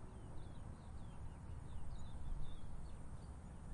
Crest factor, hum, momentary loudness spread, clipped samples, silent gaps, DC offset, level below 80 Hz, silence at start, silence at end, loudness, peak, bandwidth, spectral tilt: 14 dB; none; 3 LU; under 0.1%; none; under 0.1%; -52 dBFS; 0 s; 0 s; -54 LUFS; -32 dBFS; 10.5 kHz; -6.5 dB/octave